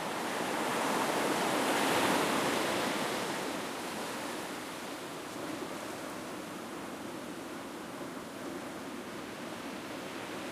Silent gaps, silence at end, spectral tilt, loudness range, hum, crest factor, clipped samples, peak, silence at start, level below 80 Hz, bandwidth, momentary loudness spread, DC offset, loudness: none; 0 s; -3 dB/octave; 11 LU; none; 18 dB; under 0.1%; -18 dBFS; 0 s; -72 dBFS; 15.5 kHz; 12 LU; under 0.1%; -35 LUFS